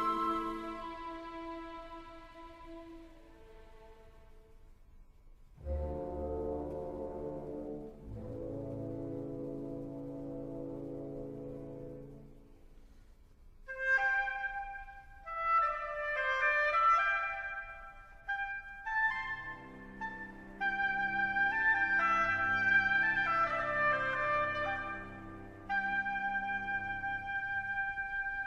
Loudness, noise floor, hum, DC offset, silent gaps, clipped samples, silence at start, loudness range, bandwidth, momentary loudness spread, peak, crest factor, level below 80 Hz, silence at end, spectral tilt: -34 LUFS; -58 dBFS; none; under 0.1%; none; under 0.1%; 0 s; 17 LU; 12 kHz; 19 LU; -18 dBFS; 18 dB; -54 dBFS; 0 s; -5.5 dB/octave